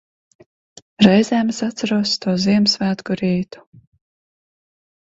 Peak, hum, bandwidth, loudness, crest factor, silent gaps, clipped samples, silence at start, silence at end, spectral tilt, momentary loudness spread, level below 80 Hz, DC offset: 0 dBFS; none; 8 kHz; -17 LUFS; 20 dB; none; under 0.1%; 1 s; 1.65 s; -5.5 dB/octave; 9 LU; -56 dBFS; under 0.1%